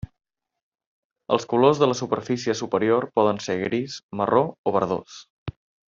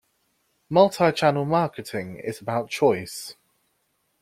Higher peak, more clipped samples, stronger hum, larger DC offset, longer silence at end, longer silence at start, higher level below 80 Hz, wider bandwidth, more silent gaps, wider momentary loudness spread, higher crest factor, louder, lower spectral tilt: about the same, -4 dBFS vs -4 dBFS; neither; neither; neither; second, 0.4 s vs 0.9 s; first, 1.3 s vs 0.7 s; about the same, -58 dBFS vs -62 dBFS; second, 7.6 kHz vs 15.5 kHz; first, 4.03-4.09 s, 4.58-4.64 s, 5.30-5.46 s vs none; first, 19 LU vs 14 LU; about the same, 20 dB vs 20 dB; about the same, -23 LUFS vs -23 LUFS; about the same, -5.5 dB/octave vs -5.5 dB/octave